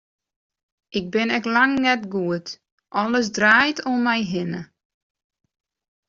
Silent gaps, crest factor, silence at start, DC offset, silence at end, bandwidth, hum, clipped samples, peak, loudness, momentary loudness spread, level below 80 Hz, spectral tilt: 2.72-2.78 s; 20 dB; 0.9 s; under 0.1%; 1.45 s; 7.6 kHz; none; under 0.1%; -4 dBFS; -21 LUFS; 14 LU; -62 dBFS; -2.5 dB/octave